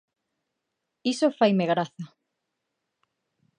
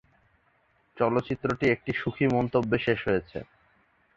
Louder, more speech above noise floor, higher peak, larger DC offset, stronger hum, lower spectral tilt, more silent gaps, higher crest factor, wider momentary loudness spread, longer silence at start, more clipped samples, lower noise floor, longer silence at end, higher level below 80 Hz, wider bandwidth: about the same, -25 LUFS vs -27 LUFS; first, 58 dB vs 41 dB; about the same, -8 dBFS vs -10 dBFS; neither; neither; second, -6 dB/octave vs -7.5 dB/octave; neither; about the same, 20 dB vs 20 dB; first, 19 LU vs 5 LU; about the same, 1.05 s vs 0.95 s; neither; first, -82 dBFS vs -67 dBFS; first, 1.5 s vs 0.7 s; second, -80 dBFS vs -54 dBFS; first, 10.5 kHz vs 7.6 kHz